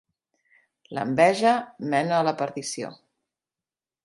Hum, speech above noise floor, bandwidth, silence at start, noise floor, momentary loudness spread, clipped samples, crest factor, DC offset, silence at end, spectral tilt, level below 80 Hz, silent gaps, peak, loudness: none; over 66 dB; 11.5 kHz; 0.9 s; under -90 dBFS; 15 LU; under 0.1%; 22 dB; under 0.1%; 1.1 s; -4.5 dB/octave; -72 dBFS; none; -4 dBFS; -24 LUFS